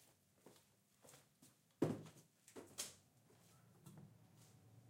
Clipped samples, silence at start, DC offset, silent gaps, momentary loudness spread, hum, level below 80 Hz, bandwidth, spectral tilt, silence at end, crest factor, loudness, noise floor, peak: under 0.1%; 0 s; under 0.1%; none; 25 LU; none; -88 dBFS; 16 kHz; -5 dB/octave; 0 s; 28 dB; -49 LUFS; -74 dBFS; -26 dBFS